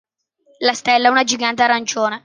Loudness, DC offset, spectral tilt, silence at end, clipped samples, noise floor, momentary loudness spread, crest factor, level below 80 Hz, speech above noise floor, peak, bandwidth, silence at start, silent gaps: -16 LUFS; under 0.1%; -1.5 dB/octave; 0.05 s; under 0.1%; -58 dBFS; 6 LU; 16 dB; -66 dBFS; 42 dB; 0 dBFS; 10 kHz; 0.6 s; none